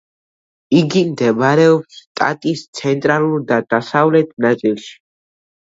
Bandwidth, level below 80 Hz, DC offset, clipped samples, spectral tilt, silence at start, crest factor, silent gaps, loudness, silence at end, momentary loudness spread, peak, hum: 7.8 kHz; -62 dBFS; under 0.1%; under 0.1%; -6.5 dB/octave; 0.7 s; 16 dB; 2.07-2.15 s, 2.68-2.73 s; -15 LUFS; 0.75 s; 9 LU; 0 dBFS; none